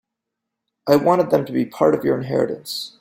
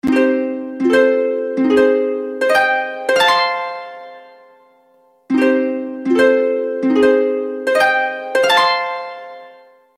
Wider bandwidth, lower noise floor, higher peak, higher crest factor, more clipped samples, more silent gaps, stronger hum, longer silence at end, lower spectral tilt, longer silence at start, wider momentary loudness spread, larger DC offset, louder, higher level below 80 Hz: about the same, 16.5 kHz vs 15 kHz; first, -82 dBFS vs -54 dBFS; about the same, -2 dBFS vs -2 dBFS; about the same, 18 dB vs 14 dB; neither; neither; neither; second, 0.1 s vs 0.45 s; first, -6 dB/octave vs -3.5 dB/octave; first, 0.85 s vs 0.05 s; about the same, 11 LU vs 11 LU; neither; second, -19 LUFS vs -15 LUFS; about the same, -60 dBFS vs -60 dBFS